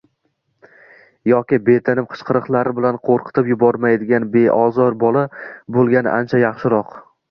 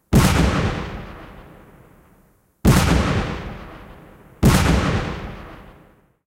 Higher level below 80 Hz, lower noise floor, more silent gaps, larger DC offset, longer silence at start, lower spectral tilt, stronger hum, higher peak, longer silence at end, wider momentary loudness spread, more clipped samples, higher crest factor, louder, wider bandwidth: second, -58 dBFS vs -28 dBFS; first, -68 dBFS vs -57 dBFS; neither; neither; first, 1.25 s vs 0.1 s; first, -10 dB/octave vs -5.5 dB/octave; neither; about the same, -2 dBFS vs -2 dBFS; second, 0.3 s vs 0.65 s; second, 6 LU vs 24 LU; neither; about the same, 16 dB vs 20 dB; first, -16 LUFS vs -19 LUFS; second, 6 kHz vs 16 kHz